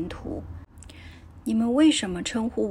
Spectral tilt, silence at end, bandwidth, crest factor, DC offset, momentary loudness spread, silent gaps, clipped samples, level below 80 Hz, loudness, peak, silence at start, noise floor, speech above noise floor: -4.5 dB/octave; 0 s; 12 kHz; 16 dB; under 0.1%; 25 LU; none; under 0.1%; -46 dBFS; -25 LUFS; -10 dBFS; 0 s; -45 dBFS; 21 dB